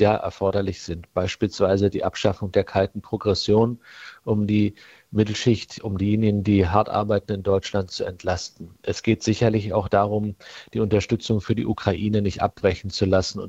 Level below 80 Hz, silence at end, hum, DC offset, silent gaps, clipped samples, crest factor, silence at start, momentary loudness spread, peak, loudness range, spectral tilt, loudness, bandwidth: -48 dBFS; 0 s; none; under 0.1%; none; under 0.1%; 20 dB; 0 s; 9 LU; -2 dBFS; 1 LU; -6.5 dB/octave; -23 LUFS; 8 kHz